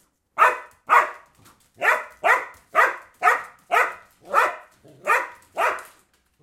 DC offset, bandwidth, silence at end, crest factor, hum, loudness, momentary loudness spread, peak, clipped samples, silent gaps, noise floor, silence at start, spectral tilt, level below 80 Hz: under 0.1%; 16.5 kHz; 0.6 s; 20 dB; none; -21 LUFS; 14 LU; -4 dBFS; under 0.1%; none; -61 dBFS; 0.35 s; -1 dB/octave; -70 dBFS